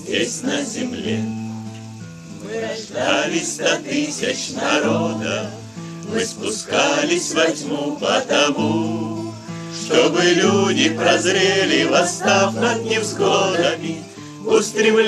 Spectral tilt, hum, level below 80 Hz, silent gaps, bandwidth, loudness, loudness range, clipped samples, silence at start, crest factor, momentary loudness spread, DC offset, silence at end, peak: -3.5 dB/octave; none; -62 dBFS; none; 14 kHz; -19 LUFS; 6 LU; under 0.1%; 0 s; 18 dB; 15 LU; under 0.1%; 0 s; -2 dBFS